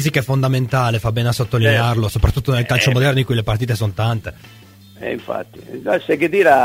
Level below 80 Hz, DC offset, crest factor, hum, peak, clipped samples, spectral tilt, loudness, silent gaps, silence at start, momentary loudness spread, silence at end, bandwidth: -34 dBFS; under 0.1%; 16 dB; none; 0 dBFS; under 0.1%; -6 dB/octave; -17 LUFS; none; 0 s; 13 LU; 0 s; 16 kHz